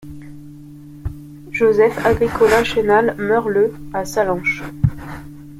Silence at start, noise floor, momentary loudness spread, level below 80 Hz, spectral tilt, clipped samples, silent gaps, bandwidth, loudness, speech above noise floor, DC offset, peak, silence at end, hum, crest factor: 0 s; -37 dBFS; 21 LU; -38 dBFS; -6 dB/octave; under 0.1%; none; 15.5 kHz; -17 LUFS; 21 dB; under 0.1%; -2 dBFS; 0 s; none; 16 dB